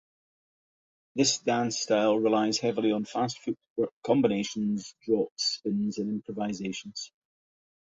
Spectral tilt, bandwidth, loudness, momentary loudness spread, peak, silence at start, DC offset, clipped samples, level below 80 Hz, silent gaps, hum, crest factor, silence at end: -4 dB/octave; 8 kHz; -28 LUFS; 10 LU; -10 dBFS; 1.15 s; under 0.1%; under 0.1%; -70 dBFS; 3.70-3.76 s, 3.92-4.02 s, 5.31-5.36 s; none; 18 dB; 0.85 s